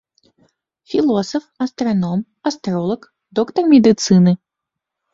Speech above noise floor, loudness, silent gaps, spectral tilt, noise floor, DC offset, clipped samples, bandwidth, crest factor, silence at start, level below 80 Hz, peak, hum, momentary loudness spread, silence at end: 67 dB; -17 LUFS; none; -6.5 dB/octave; -82 dBFS; under 0.1%; under 0.1%; 7.8 kHz; 16 dB; 0.9 s; -56 dBFS; -2 dBFS; none; 13 LU; 0.8 s